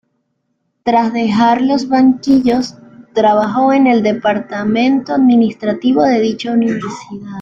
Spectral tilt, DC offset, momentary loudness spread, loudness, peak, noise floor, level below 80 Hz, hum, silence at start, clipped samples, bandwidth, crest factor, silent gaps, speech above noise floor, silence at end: -6 dB/octave; under 0.1%; 9 LU; -13 LUFS; -2 dBFS; -67 dBFS; -52 dBFS; none; 0.85 s; under 0.1%; 7.6 kHz; 12 dB; none; 54 dB; 0 s